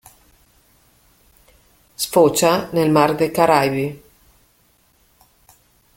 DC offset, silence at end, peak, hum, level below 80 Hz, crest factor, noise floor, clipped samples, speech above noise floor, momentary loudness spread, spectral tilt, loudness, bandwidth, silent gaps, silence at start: under 0.1%; 2 s; 0 dBFS; 60 Hz at -55 dBFS; -56 dBFS; 20 dB; -59 dBFS; under 0.1%; 43 dB; 10 LU; -4.5 dB/octave; -17 LUFS; 17 kHz; none; 2 s